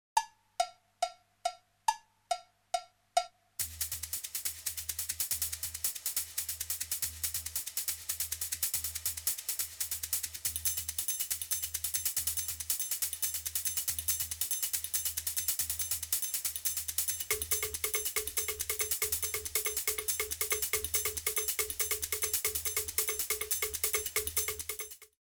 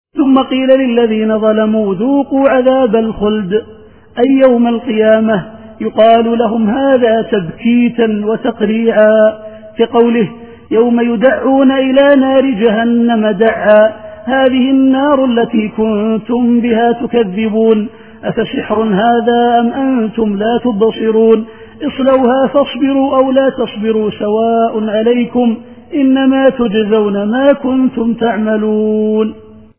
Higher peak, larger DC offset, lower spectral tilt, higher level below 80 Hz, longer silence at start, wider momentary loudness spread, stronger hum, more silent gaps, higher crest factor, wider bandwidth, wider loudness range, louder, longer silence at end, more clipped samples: second, -12 dBFS vs 0 dBFS; second, under 0.1% vs 0.4%; second, 0.5 dB/octave vs -10.5 dB/octave; second, -58 dBFS vs -46 dBFS; about the same, 0.15 s vs 0.15 s; about the same, 7 LU vs 7 LU; neither; neither; first, 24 dB vs 10 dB; first, over 20 kHz vs 3.6 kHz; about the same, 5 LU vs 3 LU; second, -33 LUFS vs -11 LUFS; second, 0.2 s vs 0.4 s; second, under 0.1% vs 0.1%